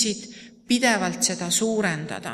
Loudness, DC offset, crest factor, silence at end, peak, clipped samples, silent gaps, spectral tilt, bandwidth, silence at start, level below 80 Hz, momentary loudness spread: -23 LUFS; under 0.1%; 18 dB; 0 s; -6 dBFS; under 0.1%; none; -2.5 dB/octave; 15.5 kHz; 0 s; -64 dBFS; 11 LU